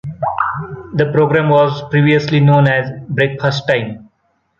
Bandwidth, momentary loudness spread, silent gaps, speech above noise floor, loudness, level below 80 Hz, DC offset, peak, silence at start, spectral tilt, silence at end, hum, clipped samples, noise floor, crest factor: 7 kHz; 10 LU; none; 50 dB; -14 LUFS; -50 dBFS; under 0.1%; -2 dBFS; 0.05 s; -7.5 dB/octave; 0.55 s; none; under 0.1%; -63 dBFS; 12 dB